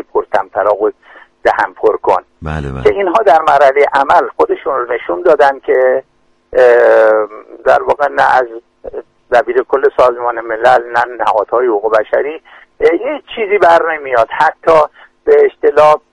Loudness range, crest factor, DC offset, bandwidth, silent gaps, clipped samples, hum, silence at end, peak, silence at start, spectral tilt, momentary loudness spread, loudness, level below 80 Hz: 2 LU; 12 dB; under 0.1%; 10.5 kHz; none; 0.2%; none; 0.15 s; 0 dBFS; 0.15 s; -5.5 dB/octave; 10 LU; -11 LUFS; -42 dBFS